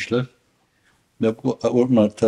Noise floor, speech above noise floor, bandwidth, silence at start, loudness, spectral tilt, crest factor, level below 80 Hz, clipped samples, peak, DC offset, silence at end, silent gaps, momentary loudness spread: -64 dBFS; 44 dB; 10.5 kHz; 0 s; -21 LUFS; -7 dB/octave; 16 dB; -62 dBFS; under 0.1%; -4 dBFS; under 0.1%; 0 s; none; 7 LU